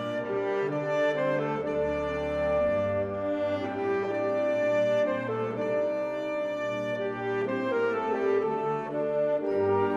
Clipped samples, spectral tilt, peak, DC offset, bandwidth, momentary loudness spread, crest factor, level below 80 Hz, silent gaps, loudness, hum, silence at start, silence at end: under 0.1%; -7 dB/octave; -16 dBFS; under 0.1%; 7.6 kHz; 5 LU; 12 dB; -56 dBFS; none; -28 LUFS; none; 0 s; 0 s